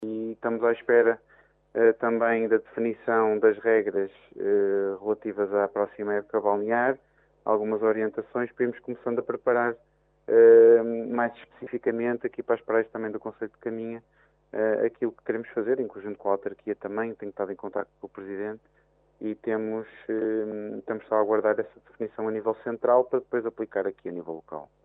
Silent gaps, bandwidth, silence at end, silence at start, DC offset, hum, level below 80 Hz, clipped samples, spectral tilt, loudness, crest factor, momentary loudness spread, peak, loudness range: none; 3.8 kHz; 0.2 s; 0 s; under 0.1%; none; -72 dBFS; under 0.1%; -10 dB/octave; -26 LUFS; 18 dB; 14 LU; -8 dBFS; 10 LU